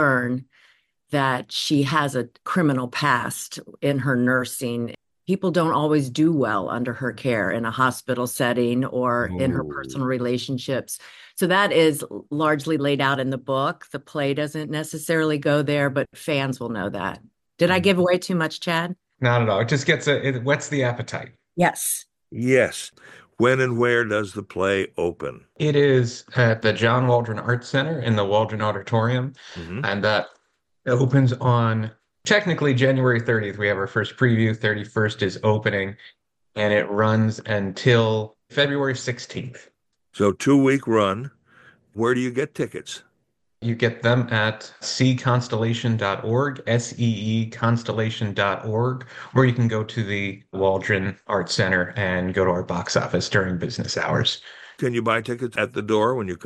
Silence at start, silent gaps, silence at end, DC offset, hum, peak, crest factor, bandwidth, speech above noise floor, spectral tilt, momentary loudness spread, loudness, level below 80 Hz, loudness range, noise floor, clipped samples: 0 s; none; 0 s; under 0.1%; none; -4 dBFS; 18 dB; 12.5 kHz; 51 dB; -5.5 dB/octave; 10 LU; -22 LUFS; -60 dBFS; 3 LU; -73 dBFS; under 0.1%